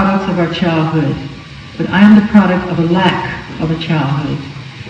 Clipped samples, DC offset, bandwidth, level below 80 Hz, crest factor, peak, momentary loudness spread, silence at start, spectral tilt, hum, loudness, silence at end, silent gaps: 0.6%; under 0.1%; 7.6 kHz; -40 dBFS; 12 dB; 0 dBFS; 16 LU; 0 s; -7.5 dB/octave; none; -13 LUFS; 0 s; none